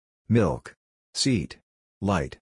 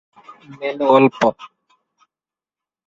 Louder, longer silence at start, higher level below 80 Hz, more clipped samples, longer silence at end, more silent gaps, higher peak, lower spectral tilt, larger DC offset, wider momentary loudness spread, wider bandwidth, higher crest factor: second, -26 LUFS vs -16 LUFS; second, 0.3 s vs 0.5 s; first, -48 dBFS vs -64 dBFS; neither; second, 0.15 s vs 1.4 s; first, 0.77-1.13 s, 1.63-2.01 s vs none; second, -8 dBFS vs -2 dBFS; about the same, -5.5 dB/octave vs -6.5 dB/octave; neither; about the same, 12 LU vs 14 LU; first, 11 kHz vs 7.6 kHz; about the same, 18 dB vs 20 dB